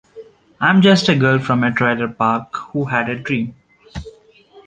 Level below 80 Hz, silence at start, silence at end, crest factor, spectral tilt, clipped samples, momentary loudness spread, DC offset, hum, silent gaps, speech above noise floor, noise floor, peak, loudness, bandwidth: -48 dBFS; 0.15 s; 0.05 s; 16 dB; -6 dB/octave; under 0.1%; 19 LU; under 0.1%; none; none; 31 dB; -47 dBFS; -2 dBFS; -16 LUFS; 9 kHz